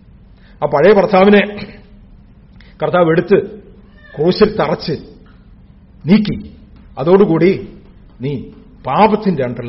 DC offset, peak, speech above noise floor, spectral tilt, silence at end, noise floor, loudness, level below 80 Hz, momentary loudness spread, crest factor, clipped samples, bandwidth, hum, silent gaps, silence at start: under 0.1%; 0 dBFS; 29 dB; -5.5 dB/octave; 0 s; -42 dBFS; -13 LUFS; -42 dBFS; 18 LU; 14 dB; under 0.1%; 6 kHz; none; none; 0.6 s